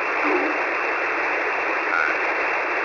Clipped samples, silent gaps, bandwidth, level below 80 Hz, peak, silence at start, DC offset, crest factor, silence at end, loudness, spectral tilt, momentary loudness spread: under 0.1%; none; 6 kHz; -64 dBFS; -8 dBFS; 0 s; under 0.1%; 14 dB; 0 s; -21 LUFS; -3 dB/octave; 2 LU